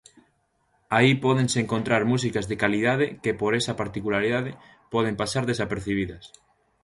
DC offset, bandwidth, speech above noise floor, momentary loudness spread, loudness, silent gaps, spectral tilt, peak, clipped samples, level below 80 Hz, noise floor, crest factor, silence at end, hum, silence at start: under 0.1%; 11.5 kHz; 45 dB; 8 LU; -24 LUFS; none; -5.5 dB/octave; -4 dBFS; under 0.1%; -52 dBFS; -69 dBFS; 20 dB; 0.55 s; none; 0.9 s